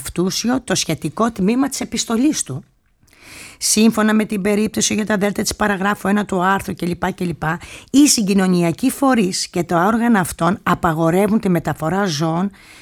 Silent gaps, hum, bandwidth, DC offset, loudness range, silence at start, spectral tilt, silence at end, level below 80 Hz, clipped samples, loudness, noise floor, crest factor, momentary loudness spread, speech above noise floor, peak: none; none; 18 kHz; under 0.1%; 3 LU; 0 s; -4.5 dB/octave; 0.3 s; -46 dBFS; under 0.1%; -17 LUFS; -53 dBFS; 14 dB; 8 LU; 36 dB; -2 dBFS